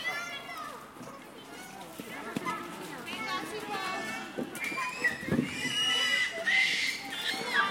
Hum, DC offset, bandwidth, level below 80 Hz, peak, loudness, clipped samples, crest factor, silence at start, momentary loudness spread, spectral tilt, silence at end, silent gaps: none; under 0.1%; 16.5 kHz; -68 dBFS; -14 dBFS; -31 LUFS; under 0.1%; 18 dB; 0 s; 19 LU; -2 dB/octave; 0 s; none